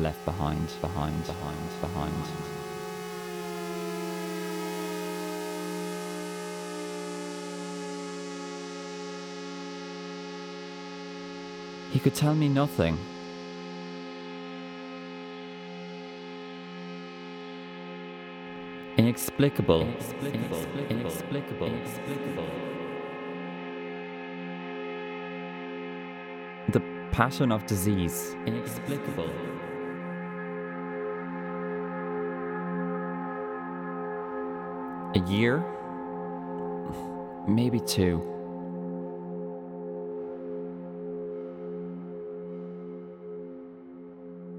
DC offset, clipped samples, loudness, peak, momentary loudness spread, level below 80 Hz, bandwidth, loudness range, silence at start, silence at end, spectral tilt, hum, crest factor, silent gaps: under 0.1%; under 0.1%; -33 LUFS; -6 dBFS; 14 LU; -54 dBFS; 19.5 kHz; 10 LU; 0 s; 0 s; -6 dB/octave; none; 26 dB; none